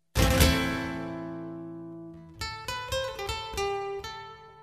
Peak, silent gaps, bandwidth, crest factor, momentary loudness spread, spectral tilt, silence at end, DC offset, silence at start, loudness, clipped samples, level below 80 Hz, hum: -8 dBFS; none; 14.5 kHz; 22 dB; 20 LU; -4.5 dB/octave; 0 s; under 0.1%; 0.15 s; -30 LUFS; under 0.1%; -36 dBFS; none